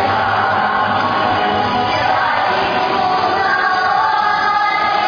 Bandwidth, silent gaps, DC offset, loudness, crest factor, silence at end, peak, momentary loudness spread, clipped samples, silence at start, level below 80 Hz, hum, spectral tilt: 5.4 kHz; none; under 0.1%; -15 LUFS; 12 dB; 0 s; -2 dBFS; 1 LU; under 0.1%; 0 s; -48 dBFS; none; -5 dB/octave